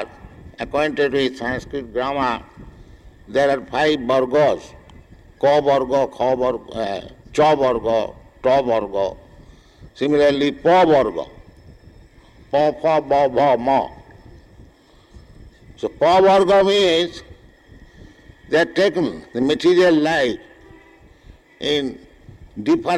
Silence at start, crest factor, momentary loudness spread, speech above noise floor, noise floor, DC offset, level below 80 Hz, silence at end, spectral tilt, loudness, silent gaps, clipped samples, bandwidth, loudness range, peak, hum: 0 s; 12 dB; 13 LU; 33 dB; -50 dBFS; under 0.1%; -48 dBFS; 0 s; -5.5 dB/octave; -18 LUFS; none; under 0.1%; 11.5 kHz; 3 LU; -8 dBFS; none